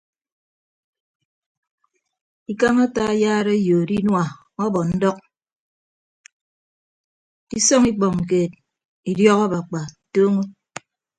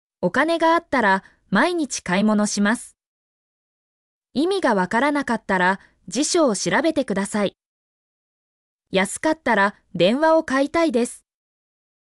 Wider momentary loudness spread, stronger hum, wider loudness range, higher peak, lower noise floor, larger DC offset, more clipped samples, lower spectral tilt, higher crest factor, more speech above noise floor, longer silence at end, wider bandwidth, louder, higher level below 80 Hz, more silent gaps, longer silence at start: first, 15 LU vs 6 LU; neither; about the same, 5 LU vs 3 LU; first, -2 dBFS vs -6 dBFS; second, -41 dBFS vs under -90 dBFS; neither; neither; about the same, -5 dB/octave vs -4 dB/octave; about the same, 20 dB vs 16 dB; second, 23 dB vs over 70 dB; second, 0.7 s vs 0.9 s; second, 9.4 kHz vs 12 kHz; about the same, -19 LUFS vs -20 LUFS; about the same, -54 dBFS vs -58 dBFS; second, 5.56-6.24 s, 6.32-7.47 s, 8.85-9.03 s vs 3.06-4.22 s, 7.66-8.79 s; first, 2.5 s vs 0.2 s